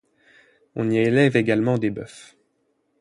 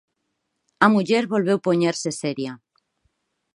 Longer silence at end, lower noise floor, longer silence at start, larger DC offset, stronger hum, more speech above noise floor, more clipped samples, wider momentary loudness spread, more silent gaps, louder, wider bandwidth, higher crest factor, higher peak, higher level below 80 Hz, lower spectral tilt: second, 0.8 s vs 1 s; second, -69 dBFS vs -76 dBFS; about the same, 0.75 s vs 0.8 s; neither; neither; second, 49 dB vs 55 dB; neither; first, 18 LU vs 10 LU; neither; about the same, -21 LUFS vs -21 LUFS; about the same, 11.5 kHz vs 11.5 kHz; about the same, 20 dB vs 22 dB; about the same, -4 dBFS vs -2 dBFS; first, -60 dBFS vs -70 dBFS; first, -7 dB/octave vs -5 dB/octave